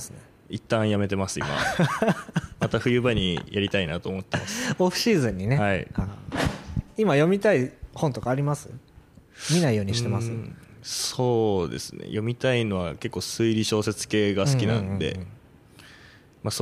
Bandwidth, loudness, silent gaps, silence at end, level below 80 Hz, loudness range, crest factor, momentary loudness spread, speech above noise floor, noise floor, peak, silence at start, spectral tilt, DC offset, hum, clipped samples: 15.5 kHz; -25 LUFS; none; 0 s; -48 dBFS; 2 LU; 16 dB; 10 LU; 27 dB; -52 dBFS; -8 dBFS; 0 s; -5 dB/octave; under 0.1%; none; under 0.1%